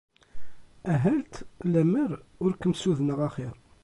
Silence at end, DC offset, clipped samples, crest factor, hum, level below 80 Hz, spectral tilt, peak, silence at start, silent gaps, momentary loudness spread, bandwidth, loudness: 0.1 s; under 0.1%; under 0.1%; 16 dB; none; -54 dBFS; -7.5 dB/octave; -12 dBFS; 0.35 s; none; 14 LU; 11.5 kHz; -27 LUFS